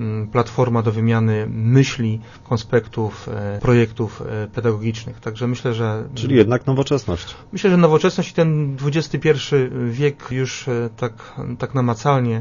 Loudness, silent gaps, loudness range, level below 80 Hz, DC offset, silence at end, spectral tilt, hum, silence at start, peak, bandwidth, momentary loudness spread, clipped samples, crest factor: -19 LUFS; none; 4 LU; -46 dBFS; under 0.1%; 0 s; -7 dB/octave; none; 0 s; 0 dBFS; 7.4 kHz; 11 LU; under 0.1%; 18 dB